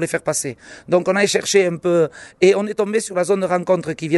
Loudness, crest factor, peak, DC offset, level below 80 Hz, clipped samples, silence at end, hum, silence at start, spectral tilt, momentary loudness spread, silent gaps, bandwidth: -18 LUFS; 16 dB; -2 dBFS; under 0.1%; -60 dBFS; under 0.1%; 0 s; none; 0 s; -4 dB/octave; 7 LU; none; 12 kHz